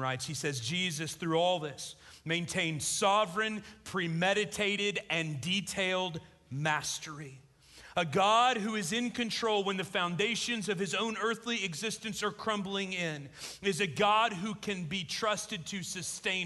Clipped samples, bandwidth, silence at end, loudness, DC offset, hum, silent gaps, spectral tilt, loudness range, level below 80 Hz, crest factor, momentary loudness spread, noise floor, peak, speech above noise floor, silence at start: under 0.1%; 12.5 kHz; 0 s; -32 LUFS; under 0.1%; none; none; -3.5 dB/octave; 3 LU; -66 dBFS; 18 dB; 10 LU; -56 dBFS; -14 dBFS; 23 dB; 0 s